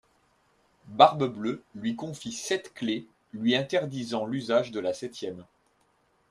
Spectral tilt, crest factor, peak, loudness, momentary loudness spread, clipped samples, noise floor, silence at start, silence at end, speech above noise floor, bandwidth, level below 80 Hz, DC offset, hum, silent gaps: -4.5 dB/octave; 26 dB; -2 dBFS; -28 LUFS; 16 LU; under 0.1%; -68 dBFS; 0.85 s; 0.9 s; 41 dB; 13.5 kHz; -70 dBFS; under 0.1%; none; none